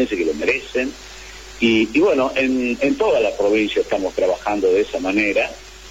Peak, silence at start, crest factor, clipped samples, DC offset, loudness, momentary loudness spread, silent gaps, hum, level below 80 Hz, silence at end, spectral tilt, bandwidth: -4 dBFS; 0 s; 14 dB; under 0.1%; under 0.1%; -19 LUFS; 10 LU; none; none; -44 dBFS; 0 s; -4.5 dB/octave; 15.5 kHz